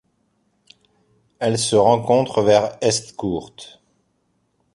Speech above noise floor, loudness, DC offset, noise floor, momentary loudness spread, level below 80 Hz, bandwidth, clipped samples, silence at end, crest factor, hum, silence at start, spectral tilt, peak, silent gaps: 49 dB; -18 LUFS; under 0.1%; -67 dBFS; 18 LU; -54 dBFS; 11.5 kHz; under 0.1%; 1.1 s; 20 dB; none; 1.4 s; -4.5 dB/octave; -2 dBFS; none